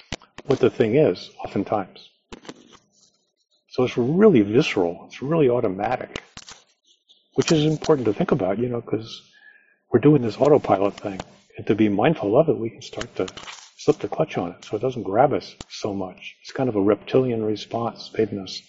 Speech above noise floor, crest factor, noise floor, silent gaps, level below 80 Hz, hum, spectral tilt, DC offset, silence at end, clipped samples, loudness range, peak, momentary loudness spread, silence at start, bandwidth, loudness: 40 dB; 20 dB; -62 dBFS; none; -54 dBFS; none; -6 dB/octave; under 0.1%; 0.1 s; under 0.1%; 4 LU; -2 dBFS; 17 LU; 0.1 s; 8 kHz; -22 LUFS